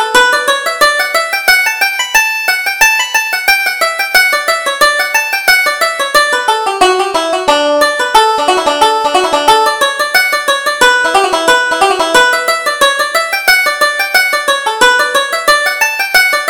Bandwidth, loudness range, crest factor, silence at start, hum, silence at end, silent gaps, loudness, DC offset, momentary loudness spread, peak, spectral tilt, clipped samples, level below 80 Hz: over 20 kHz; 1 LU; 10 dB; 0 s; none; 0 s; none; -9 LUFS; under 0.1%; 4 LU; 0 dBFS; 0 dB/octave; 0.2%; -44 dBFS